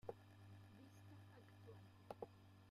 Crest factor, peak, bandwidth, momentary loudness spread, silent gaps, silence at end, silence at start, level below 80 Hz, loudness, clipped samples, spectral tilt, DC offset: 26 dB; -34 dBFS; 15 kHz; 7 LU; none; 0 s; 0.05 s; -84 dBFS; -62 LUFS; under 0.1%; -7 dB/octave; under 0.1%